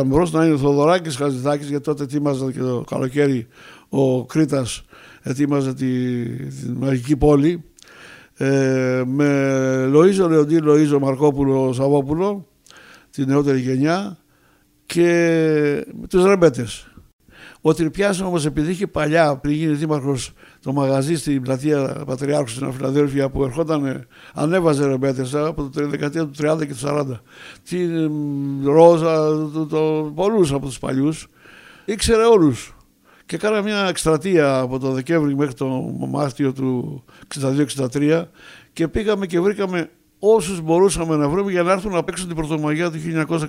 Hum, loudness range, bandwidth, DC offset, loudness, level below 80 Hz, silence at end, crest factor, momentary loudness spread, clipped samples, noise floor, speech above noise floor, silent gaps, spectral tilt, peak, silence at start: none; 5 LU; 15.5 kHz; under 0.1%; -19 LUFS; -44 dBFS; 0 s; 18 dB; 11 LU; under 0.1%; -57 dBFS; 39 dB; 17.13-17.19 s; -6.5 dB/octave; 0 dBFS; 0 s